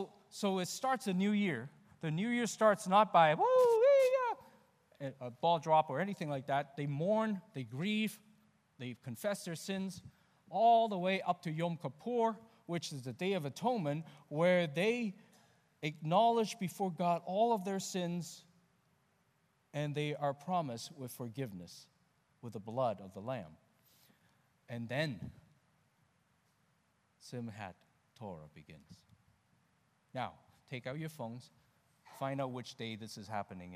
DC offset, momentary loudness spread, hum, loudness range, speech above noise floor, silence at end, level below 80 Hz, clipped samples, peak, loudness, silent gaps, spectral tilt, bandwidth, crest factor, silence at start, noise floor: under 0.1%; 20 LU; none; 18 LU; 40 dB; 0 s; -80 dBFS; under 0.1%; -14 dBFS; -35 LUFS; none; -5.5 dB/octave; 15.5 kHz; 22 dB; 0 s; -76 dBFS